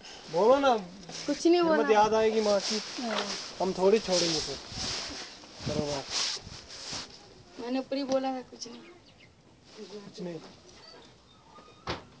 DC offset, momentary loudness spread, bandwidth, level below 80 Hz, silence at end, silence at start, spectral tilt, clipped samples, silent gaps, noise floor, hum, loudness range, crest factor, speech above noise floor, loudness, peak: under 0.1%; 20 LU; 8 kHz; -58 dBFS; 0.15 s; 0 s; -3.5 dB/octave; under 0.1%; none; -57 dBFS; none; 18 LU; 20 dB; 29 dB; -28 LUFS; -10 dBFS